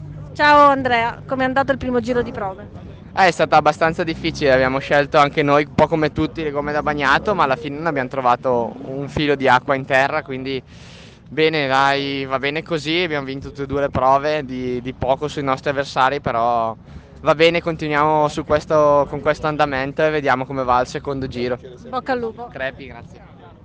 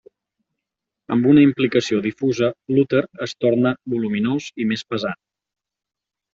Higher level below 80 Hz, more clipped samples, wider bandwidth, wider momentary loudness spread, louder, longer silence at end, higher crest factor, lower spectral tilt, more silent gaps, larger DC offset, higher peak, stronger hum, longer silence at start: first, -44 dBFS vs -60 dBFS; neither; first, 9.4 kHz vs 7.6 kHz; about the same, 12 LU vs 11 LU; about the same, -18 LUFS vs -20 LUFS; second, 0.15 s vs 1.2 s; about the same, 16 dB vs 18 dB; about the same, -5.5 dB/octave vs -6.5 dB/octave; neither; neither; about the same, -2 dBFS vs -4 dBFS; neither; second, 0 s vs 1.1 s